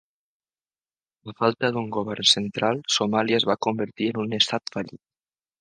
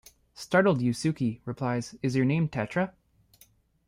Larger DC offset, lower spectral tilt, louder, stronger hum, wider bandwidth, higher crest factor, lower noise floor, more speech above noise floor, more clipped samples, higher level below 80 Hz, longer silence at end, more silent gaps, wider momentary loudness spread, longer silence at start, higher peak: neither; second, -3.5 dB/octave vs -6.5 dB/octave; first, -23 LUFS vs -28 LUFS; neither; second, 10 kHz vs 16 kHz; about the same, 24 dB vs 20 dB; first, under -90 dBFS vs -62 dBFS; first, over 66 dB vs 35 dB; neither; about the same, -66 dBFS vs -62 dBFS; second, 0.65 s vs 1 s; neither; first, 11 LU vs 8 LU; first, 1.25 s vs 0.35 s; first, -2 dBFS vs -10 dBFS